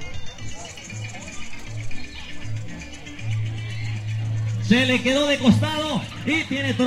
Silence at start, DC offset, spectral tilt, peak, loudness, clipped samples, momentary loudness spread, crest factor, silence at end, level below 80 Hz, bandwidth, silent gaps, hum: 0 s; under 0.1%; -5.5 dB/octave; -4 dBFS; -23 LUFS; under 0.1%; 18 LU; 18 dB; 0 s; -42 dBFS; 12.5 kHz; none; none